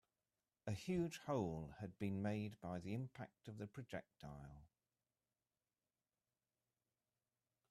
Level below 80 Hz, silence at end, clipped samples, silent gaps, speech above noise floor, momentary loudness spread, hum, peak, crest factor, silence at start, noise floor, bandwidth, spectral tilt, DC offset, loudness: -74 dBFS; 3.05 s; under 0.1%; none; over 43 dB; 13 LU; none; -30 dBFS; 20 dB; 0.65 s; under -90 dBFS; 14 kHz; -7 dB/octave; under 0.1%; -48 LUFS